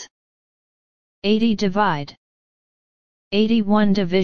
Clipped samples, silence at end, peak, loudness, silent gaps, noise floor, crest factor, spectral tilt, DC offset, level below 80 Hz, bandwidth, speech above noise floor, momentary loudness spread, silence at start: under 0.1%; 0 s; -4 dBFS; -19 LUFS; 0.11-1.22 s, 2.17-3.31 s; under -90 dBFS; 18 dB; -6.5 dB/octave; under 0.1%; -50 dBFS; 6.8 kHz; over 72 dB; 9 LU; 0 s